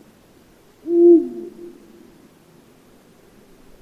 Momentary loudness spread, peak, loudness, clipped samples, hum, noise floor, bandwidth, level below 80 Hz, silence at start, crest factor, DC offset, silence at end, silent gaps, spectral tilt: 28 LU; -4 dBFS; -15 LUFS; under 0.1%; none; -51 dBFS; 2.8 kHz; -62 dBFS; 0.85 s; 18 dB; under 0.1%; 2.35 s; none; -8 dB/octave